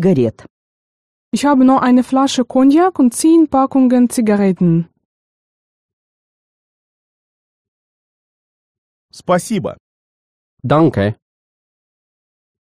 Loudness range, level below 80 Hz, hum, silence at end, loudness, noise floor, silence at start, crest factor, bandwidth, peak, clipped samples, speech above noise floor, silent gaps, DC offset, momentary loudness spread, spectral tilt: 12 LU; -54 dBFS; none; 1.45 s; -13 LUFS; under -90 dBFS; 0 s; 14 dB; 13 kHz; -2 dBFS; under 0.1%; over 78 dB; 0.50-1.32 s, 5.05-9.09 s, 9.80-10.57 s; under 0.1%; 10 LU; -6.5 dB/octave